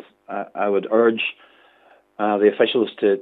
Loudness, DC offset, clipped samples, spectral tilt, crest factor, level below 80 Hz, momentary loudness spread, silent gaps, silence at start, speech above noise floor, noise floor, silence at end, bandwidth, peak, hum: -20 LUFS; under 0.1%; under 0.1%; -8 dB/octave; 18 dB; -82 dBFS; 12 LU; none; 0.3 s; 35 dB; -55 dBFS; 0 s; 4.1 kHz; -4 dBFS; 50 Hz at -75 dBFS